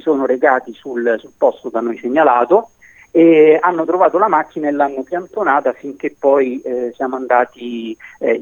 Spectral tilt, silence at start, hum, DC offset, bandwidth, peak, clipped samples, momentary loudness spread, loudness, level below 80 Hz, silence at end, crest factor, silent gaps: -7 dB/octave; 0.05 s; none; under 0.1%; 6.8 kHz; 0 dBFS; under 0.1%; 12 LU; -15 LUFS; -64 dBFS; 0 s; 14 dB; none